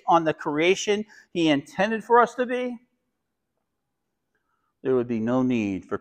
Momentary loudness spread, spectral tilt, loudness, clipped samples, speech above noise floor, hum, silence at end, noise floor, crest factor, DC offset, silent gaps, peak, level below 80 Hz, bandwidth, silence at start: 10 LU; -5 dB/octave; -24 LUFS; under 0.1%; 57 dB; none; 0.05 s; -81 dBFS; 20 dB; under 0.1%; none; -4 dBFS; -64 dBFS; 9.4 kHz; 0.05 s